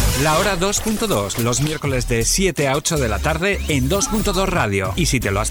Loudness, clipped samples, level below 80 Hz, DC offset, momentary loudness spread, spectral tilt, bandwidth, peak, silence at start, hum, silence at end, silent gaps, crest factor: -18 LUFS; under 0.1%; -28 dBFS; under 0.1%; 3 LU; -4 dB/octave; over 20 kHz; -6 dBFS; 0 s; none; 0 s; none; 12 dB